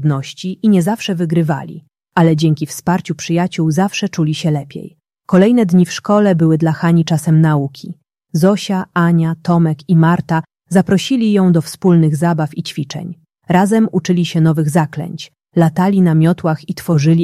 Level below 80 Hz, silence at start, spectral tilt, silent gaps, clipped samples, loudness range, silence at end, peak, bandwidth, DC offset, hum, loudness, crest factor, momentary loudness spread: -54 dBFS; 0 s; -7 dB/octave; none; under 0.1%; 3 LU; 0 s; -2 dBFS; 13.5 kHz; under 0.1%; none; -14 LUFS; 12 dB; 11 LU